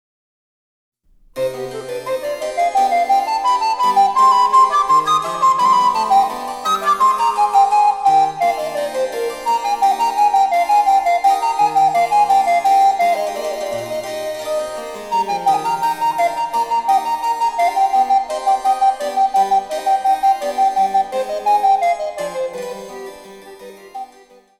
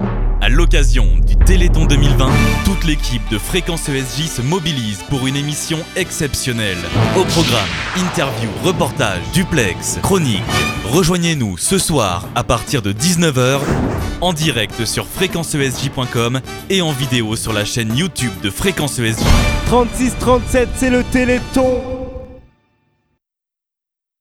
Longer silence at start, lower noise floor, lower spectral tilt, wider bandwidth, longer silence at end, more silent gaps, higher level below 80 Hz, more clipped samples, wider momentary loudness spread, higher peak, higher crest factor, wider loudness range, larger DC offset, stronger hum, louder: first, 1.35 s vs 0 s; second, -47 dBFS vs -85 dBFS; second, -2.5 dB/octave vs -4.5 dB/octave; about the same, 15.5 kHz vs 16.5 kHz; second, 0.55 s vs 1.8 s; neither; second, -56 dBFS vs -20 dBFS; neither; first, 11 LU vs 6 LU; about the same, -2 dBFS vs 0 dBFS; about the same, 14 dB vs 16 dB; first, 6 LU vs 3 LU; neither; neither; about the same, -16 LUFS vs -16 LUFS